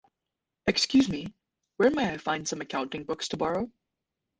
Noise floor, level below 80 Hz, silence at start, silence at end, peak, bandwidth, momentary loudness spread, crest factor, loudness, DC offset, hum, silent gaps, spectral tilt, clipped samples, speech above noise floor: -86 dBFS; -58 dBFS; 0.65 s; 0.7 s; -10 dBFS; 9.8 kHz; 10 LU; 20 dB; -28 LUFS; under 0.1%; none; none; -4 dB/octave; under 0.1%; 59 dB